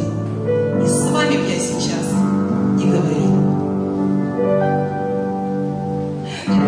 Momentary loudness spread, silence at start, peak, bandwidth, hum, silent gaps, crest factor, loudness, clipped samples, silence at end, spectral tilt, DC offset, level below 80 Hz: 6 LU; 0 s; -6 dBFS; 10.5 kHz; none; none; 12 dB; -18 LUFS; under 0.1%; 0 s; -6 dB/octave; under 0.1%; -50 dBFS